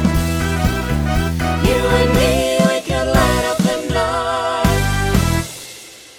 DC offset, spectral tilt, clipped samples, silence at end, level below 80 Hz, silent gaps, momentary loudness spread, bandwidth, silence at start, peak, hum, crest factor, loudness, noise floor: under 0.1%; -5 dB/octave; under 0.1%; 0.1 s; -24 dBFS; none; 5 LU; over 20 kHz; 0 s; 0 dBFS; none; 16 dB; -17 LUFS; -37 dBFS